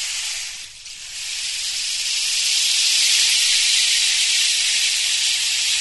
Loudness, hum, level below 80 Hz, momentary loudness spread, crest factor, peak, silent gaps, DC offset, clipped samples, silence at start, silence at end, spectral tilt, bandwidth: -16 LUFS; none; -58 dBFS; 14 LU; 16 dB; -4 dBFS; none; 0.2%; under 0.1%; 0 s; 0 s; 5.5 dB/octave; 12 kHz